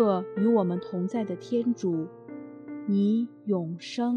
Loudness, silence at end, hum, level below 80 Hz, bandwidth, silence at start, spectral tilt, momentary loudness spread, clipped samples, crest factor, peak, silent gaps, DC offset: -28 LUFS; 0 s; none; -76 dBFS; 8.4 kHz; 0 s; -8 dB/octave; 15 LU; under 0.1%; 16 dB; -10 dBFS; none; under 0.1%